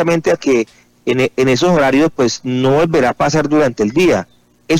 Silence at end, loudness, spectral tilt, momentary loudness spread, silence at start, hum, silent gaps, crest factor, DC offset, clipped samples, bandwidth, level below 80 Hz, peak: 0 s; -14 LUFS; -5.5 dB/octave; 5 LU; 0 s; none; none; 10 dB; under 0.1%; under 0.1%; 16 kHz; -44 dBFS; -4 dBFS